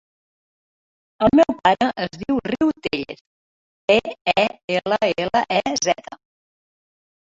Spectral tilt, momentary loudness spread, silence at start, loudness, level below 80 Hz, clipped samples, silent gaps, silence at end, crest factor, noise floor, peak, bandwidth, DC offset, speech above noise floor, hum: -4 dB/octave; 11 LU; 1.2 s; -20 LUFS; -52 dBFS; under 0.1%; 3.21-3.88 s, 4.21-4.25 s, 4.64-4.68 s; 1.2 s; 18 dB; under -90 dBFS; -4 dBFS; 7.8 kHz; under 0.1%; over 70 dB; none